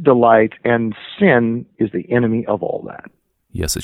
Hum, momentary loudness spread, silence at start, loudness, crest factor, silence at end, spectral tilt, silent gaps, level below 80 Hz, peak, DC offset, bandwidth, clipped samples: none; 15 LU; 0 s; -17 LUFS; 16 dB; 0 s; -5.5 dB/octave; none; -42 dBFS; 0 dBFS; under 0.1%; 16 kHz; under 0.1%